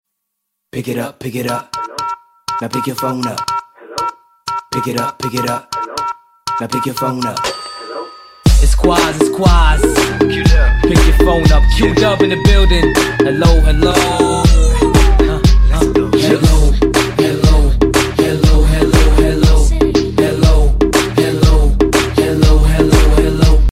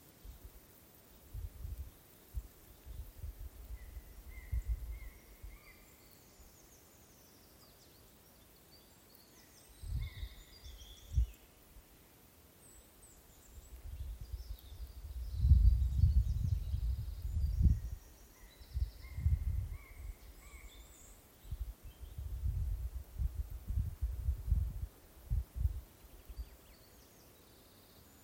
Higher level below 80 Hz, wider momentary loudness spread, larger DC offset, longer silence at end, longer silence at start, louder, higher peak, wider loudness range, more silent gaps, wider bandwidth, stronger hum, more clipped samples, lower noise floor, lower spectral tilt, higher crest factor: first, -14 dBFS vs -40 dBFS; second, 11 LU vs 24 LU; neither; second, 0 s vs 0.25 s; first, 0.75 s vs 0.05 s; first, -13 LUFS vs -39 LUFS; first, 0 dBFS vs -16 dBFS; second, 9 LU vs 18 LU; neither; about the same, 15 kHz vs 16.5 kHz; neither; neither; first, -73 dBFS vs -62 dBFS; about the same, -5.5 dB/octave vs -6.5 dB/octave; second, 10 dB vs 24 dB